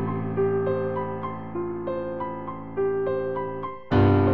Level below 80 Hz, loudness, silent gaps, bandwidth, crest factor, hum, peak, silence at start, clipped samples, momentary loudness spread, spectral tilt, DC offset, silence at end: -48 dBFS; -27 LUFS; none; 5 kHz; 18 dB; none; -8 dBFS; 0 s; under 0.1%; 11 LU; -10.5 dB/octave; 0.6%; 0 s